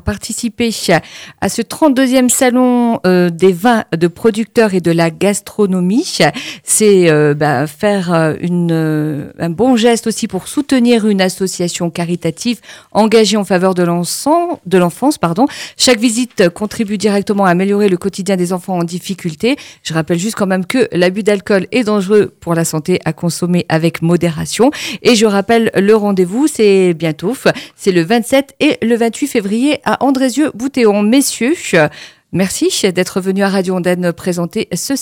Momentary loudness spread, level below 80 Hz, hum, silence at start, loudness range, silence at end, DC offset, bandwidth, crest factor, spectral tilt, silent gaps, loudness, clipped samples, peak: 8 LU; -46 dBFS; none; 0.05 s; 3 LU; 0 s; under 0.1%; 17.5 kHz; 12 dB; -5 dB/octave; none; -13 LUFS; under 0.1%; 0 dBFS